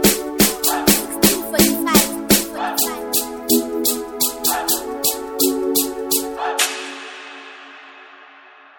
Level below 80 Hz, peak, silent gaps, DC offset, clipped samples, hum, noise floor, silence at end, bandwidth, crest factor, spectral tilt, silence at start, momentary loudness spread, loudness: -44 dBFS; 0 dBFS; none; under 0.1%; under 0.1%; none; -45 dBFS; 0.55 s; over 20 kHz; 20 dB; -2.5 dB/octave; 0 s; 14 LU; -17 LUFS